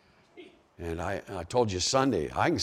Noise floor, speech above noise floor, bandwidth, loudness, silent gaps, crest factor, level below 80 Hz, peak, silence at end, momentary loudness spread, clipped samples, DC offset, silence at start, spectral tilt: -53 dBFS; 25 dB; 15.5 kHz; -29 LUFS; none; 20 dB; -56 dBFS; -10 dBFS; 0 s; 11 LU; under 0.1%; under 0.1%; 0.35 s; -4 dB/octave